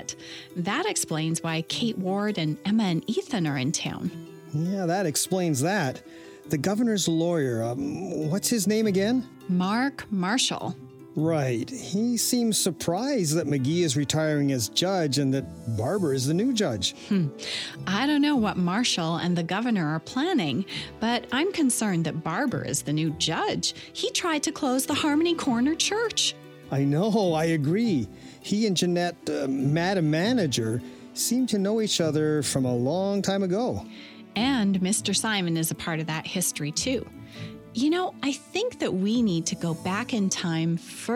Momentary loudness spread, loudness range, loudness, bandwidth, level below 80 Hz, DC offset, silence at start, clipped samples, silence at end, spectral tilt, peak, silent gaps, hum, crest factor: 7 LU; 2 LU; -26 LUFS; 18 kHz; -60 dBFS; under 0.1%; 0 s; under 0.1%; 0 s; -4.5 dB/octave; -10 dBFS; none; none; 16 dB